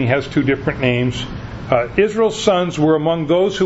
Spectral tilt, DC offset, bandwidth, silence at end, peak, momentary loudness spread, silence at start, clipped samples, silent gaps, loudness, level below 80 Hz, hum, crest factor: -6 dB/octave; under 0.1%; 8 kHz; 0 s; 0 dBFS; 6 LU; 0 s; under 0.1%; none; -17 LUFS; -40 dBFS; none; 16 dB